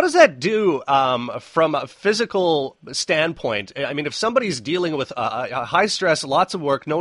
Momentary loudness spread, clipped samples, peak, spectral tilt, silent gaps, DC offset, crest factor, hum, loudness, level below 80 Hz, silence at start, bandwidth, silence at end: 7 LU; under 0.1%; 0 dBFS; -4 dB/octave; none; under 0.1%; 20 dB; none; -20 LUFS; -60 dBFS; 0 s; 11.5 kHz; 0 s